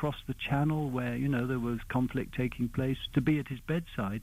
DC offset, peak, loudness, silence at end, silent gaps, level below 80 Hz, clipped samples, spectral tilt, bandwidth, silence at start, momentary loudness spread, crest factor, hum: under 0.1%; -16 dBFS; -32 LUFS; 0 s; none; -48 dBFS; under 0.1%; -7.5 dB/octave; 16 kHz; 0 s; 5 LU; 16 dB; none